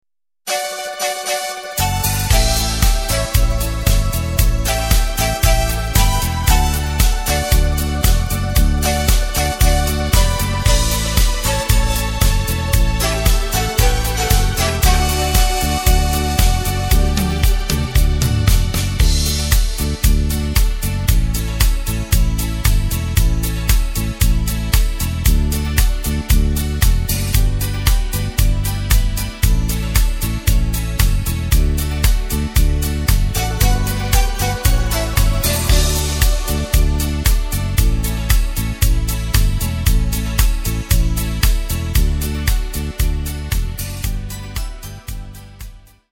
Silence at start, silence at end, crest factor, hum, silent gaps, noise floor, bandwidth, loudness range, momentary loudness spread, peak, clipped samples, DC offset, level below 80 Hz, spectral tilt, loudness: 0.45 s; 0.3 s; 16 dB; none; none; -36 dBFS; 17 kHz; 2 LU; 5 LU; 0 dBFS; under 0.1%; under 0.1%; -16 dBFS; -4 dB/octave; -18 LUFS